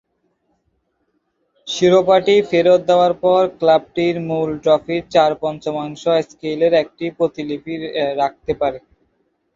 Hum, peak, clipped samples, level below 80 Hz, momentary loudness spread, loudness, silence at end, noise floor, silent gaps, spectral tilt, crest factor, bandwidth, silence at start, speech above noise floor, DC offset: none; -2 dBFS; under 0.1%; -54 dBFS; 12 LU; -17 LUFS; 0.8 s; -68 dBFS; none; -5.5 dB/octave; 16 dB; 7.6 kHz; 1.65 s; 51 dB; under 0.1%